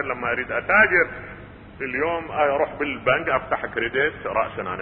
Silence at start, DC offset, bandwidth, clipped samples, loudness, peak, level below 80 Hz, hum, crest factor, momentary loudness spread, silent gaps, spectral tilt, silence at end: 0 s; under 0.1%; 4.9 kHz; under 0.1%; -22 LUFS; -4 dBFS; -50 dBFS; none; 20 dB; 11 LU; none; -9.5 dB/octave; 0 s